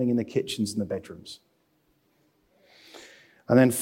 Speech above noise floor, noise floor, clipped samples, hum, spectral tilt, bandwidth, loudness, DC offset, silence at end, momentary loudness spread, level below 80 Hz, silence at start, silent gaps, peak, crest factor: 44 dB; -69 dBFS; under 0.1%; none; -5.5 dB/octave; 16.5 kHz; -26 LUFS; under 0.1%; 0 s; 27 LU; -68 dBFS; 0 s; none; -8 dBFS; 20 dB